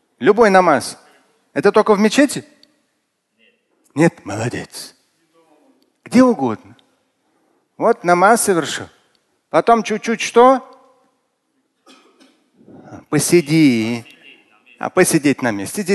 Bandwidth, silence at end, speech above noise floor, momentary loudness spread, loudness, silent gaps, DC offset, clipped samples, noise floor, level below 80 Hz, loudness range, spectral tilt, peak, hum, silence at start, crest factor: 12.5 kHz; 0 s; 55 dB; 16 LU; -15 LUFS; none; under 0.1%; under 0.1%; -69 dBFS; -58 dBFS; 6 LU; -5 dB/octave; 0 dBFS; none; 0.2 s; 18 dB